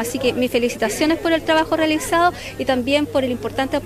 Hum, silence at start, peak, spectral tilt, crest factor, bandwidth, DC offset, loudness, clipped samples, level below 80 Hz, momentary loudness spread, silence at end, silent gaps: none; 0 s; -4 dBFS; -4 dB/octave; 14 dB; 15 kHz; under 0.1%; -19 LUFS; under 0.1%; -44 dBFS; 5 LU; 0 s; none